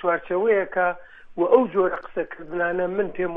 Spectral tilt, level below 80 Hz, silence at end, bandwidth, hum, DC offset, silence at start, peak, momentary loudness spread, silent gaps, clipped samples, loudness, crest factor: -9.5 dB/octave; -54 dBFS; 0 s; 3.8 kHz; none; under 0.1%; 0 s; -2 dBFS; 12 LU; none; under 0.1%; -23 LUFS; 20 dB